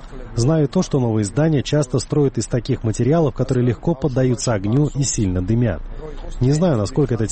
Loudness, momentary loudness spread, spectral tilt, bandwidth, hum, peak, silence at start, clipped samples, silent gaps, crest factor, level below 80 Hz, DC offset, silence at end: -19 LUFS; 5 LU; -6.5 dB/octave; 8.8 kHz; none; -8 dBFS; 0 s; under 0.1%; none; 12 dB; -34 dBFS; 0.2%; 0 s